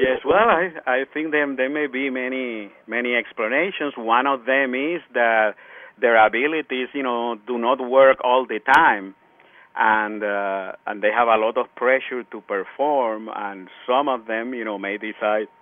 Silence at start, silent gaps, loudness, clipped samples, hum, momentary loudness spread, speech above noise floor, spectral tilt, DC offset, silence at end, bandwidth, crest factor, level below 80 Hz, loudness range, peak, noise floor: 0 s; none; -21 LUFS; under 0.1%; none; 12 LU; 31 dB; -5.5 dB/octave; under 0.1%; 0.15 s; 7.2 kHz; 20 dB; -60 dBFS; 4 LU; -2 dBFS; -52 dBFS